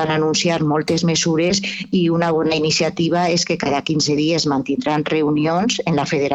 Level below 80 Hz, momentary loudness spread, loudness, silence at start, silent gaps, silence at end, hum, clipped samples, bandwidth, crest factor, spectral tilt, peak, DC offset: -52 dBFS; 3 LU; -18 LUFS; 0 s; none; 0 s; none; under 0.1%; 8.8 kHz; 14 dB; -4.5 dB/octave; -4 dBFS; under 0.1%